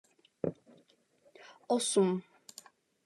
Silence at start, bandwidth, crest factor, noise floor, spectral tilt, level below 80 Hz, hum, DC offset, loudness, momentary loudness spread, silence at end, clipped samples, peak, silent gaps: 0.45 s; 13 kHz; 20 dB; -68 dBFS; -4.5 dB/octave; -80 dBFS; none; under 0.1%; -32 LUFS; 25 LU; 0.85 s; under 0.1%; -16 dBFS; none